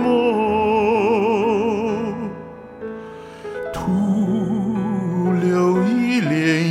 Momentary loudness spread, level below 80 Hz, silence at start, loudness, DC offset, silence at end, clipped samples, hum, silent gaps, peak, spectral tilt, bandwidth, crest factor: 15 LU; -50 dBFS; 0 s; -19 LUFS; under 0.1%; 0 s; under 0.1%; none; none; -6 dBFS; -7 dB/octave; 14 kHz; 12 dB